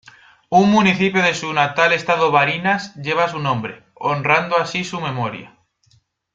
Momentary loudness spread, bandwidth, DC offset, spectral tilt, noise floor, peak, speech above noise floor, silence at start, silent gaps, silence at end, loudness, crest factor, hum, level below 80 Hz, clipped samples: 10 LU; 7.8 kHz; under 0.1%; -5 dB/octave; -59 dBFS; -2 dBFS; 42 dB; 0.5 s; none; 0.85 s; -17 LUFS; 18 dB; none; -58 dBFS; under 0.1%